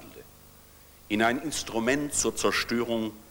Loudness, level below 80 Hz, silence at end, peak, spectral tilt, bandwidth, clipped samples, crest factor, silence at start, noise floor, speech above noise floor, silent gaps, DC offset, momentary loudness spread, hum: -27 LUFS; -54 dBFS; 0.05 s; -10 dBFS; -3 dB/octave; over 20 kHz; under 0.1%; 20 dB; 0 s; -53 dBFS; 25 dB; none; under 0.1%; 6 LU; 50 Hz at -60 dBFS